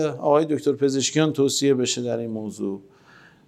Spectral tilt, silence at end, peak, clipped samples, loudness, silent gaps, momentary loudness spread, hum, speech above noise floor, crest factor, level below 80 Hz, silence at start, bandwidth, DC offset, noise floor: -4.5 dB/octave; 0.65 s; -4 dBFS; under 0.1%; -22 LUFS; none; 11 LU; none; 30 dB; 18 dB; -74 dBFS; 0 s; 14 kHz; under 0.1%; -52 dBFS